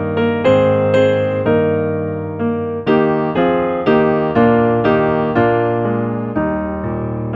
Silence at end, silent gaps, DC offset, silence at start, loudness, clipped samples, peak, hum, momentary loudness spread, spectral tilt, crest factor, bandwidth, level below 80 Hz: 0 s; none; under 0.1%; 0 s; -15 LUFS; under 0.1%; -2 dBFS; none; 8 LU; -9 dB/octave; 14 dB; 7.4 kHz; -42 dBFS